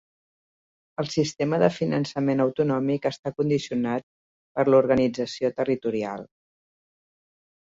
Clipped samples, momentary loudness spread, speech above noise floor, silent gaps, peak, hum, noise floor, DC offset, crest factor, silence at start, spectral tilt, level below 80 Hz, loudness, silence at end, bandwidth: under 0.1%; 11 LU; over 66 dB; 3.19-3.23 s, 4.03-4.55 s; -4 dBFS; none; under -90 dBFS; under 0.1%; 20 dB; 1 s; -6.5 dB/octave; -62 dBFS; -25 LUFS; 1.5 s; 7.8 kHz